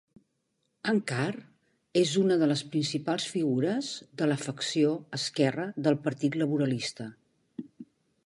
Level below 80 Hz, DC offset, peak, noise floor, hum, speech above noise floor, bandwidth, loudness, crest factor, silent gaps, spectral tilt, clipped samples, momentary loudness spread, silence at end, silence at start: -74 dBFS; under 0.1%; -12 dBFS; -77 dBFS; none; 49 dB; 11.5 kHz; -29 LUFS; 18 dB; none; -5 dB/octave; under 0.1%; 18 LU; 0.4 s; 0.85 s